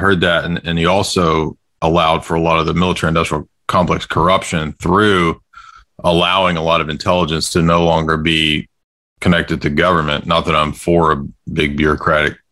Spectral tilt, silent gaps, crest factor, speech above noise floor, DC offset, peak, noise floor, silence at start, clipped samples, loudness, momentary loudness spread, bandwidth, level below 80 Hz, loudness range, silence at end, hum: -5 dB/octave; 8.84-9.16 s; 14 dB; 27 dB; under 0.1%; 0 dBFS; -41 dBFS; 0 s; under 0.1%; -15 LUFS; 6 LU; 15 kHz; -38 dBFS; 1 LU; 0.15 s; none